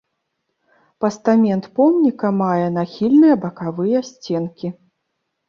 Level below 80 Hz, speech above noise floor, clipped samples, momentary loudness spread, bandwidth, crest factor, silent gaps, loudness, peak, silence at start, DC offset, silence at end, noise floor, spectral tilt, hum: -62 dBFS; 57 dB; under 0.1%; 12 LU; 7.2 kHz; 16 dB; none; -18 LUFS; -2 dBFS; 1 s; under 0.1%; 0.75 s; -74 dBFS; -8 dB/octave; none